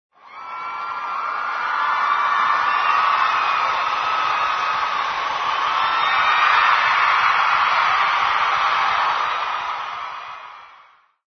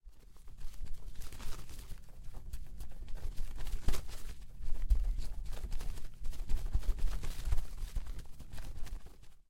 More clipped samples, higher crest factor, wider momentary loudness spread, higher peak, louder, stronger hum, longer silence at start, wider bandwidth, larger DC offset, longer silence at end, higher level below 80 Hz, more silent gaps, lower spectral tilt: neither; about the same, 18 dB vs 18 dB; about the same, 13 LU vs 14 LU; first, -2 dBFS vs -14 dBFS; first, -18 LUFS vs -45 LUFS; neither; first, 0.25 s vs 0.05 s; second, 6.6 kHz vs 13.5 kHz; neither; first, 0.6 s vs 0.1 s; second, -62 dBFS vs -38 dBFS; neither; second, -1 dB/octave vs -5 dB/octave